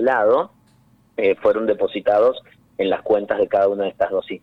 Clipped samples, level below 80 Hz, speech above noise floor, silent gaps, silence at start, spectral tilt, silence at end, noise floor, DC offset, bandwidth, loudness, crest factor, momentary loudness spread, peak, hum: under 0.1%; -58 dBFS; 37 dB; none; 0 s; -7 dB/octave; 0.05 s; -56 dBFS; under 0.1%; 5 kHz; -19 LUFS; 14 dB; 10 LU; -6 dBFS; none